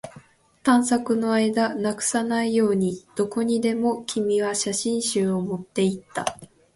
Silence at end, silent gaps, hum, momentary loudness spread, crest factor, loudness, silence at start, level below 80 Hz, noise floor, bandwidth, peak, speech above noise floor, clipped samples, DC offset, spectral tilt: 0.3 s; none; none; 7 LU; 18 dB; -23 LUFS; 0.05 s; -62 dBFS; -51 dBFS; 11.5 kHz; -6 dBFS; 28 dB; under 0.1%; under 0.1%; -4.5 dB/octave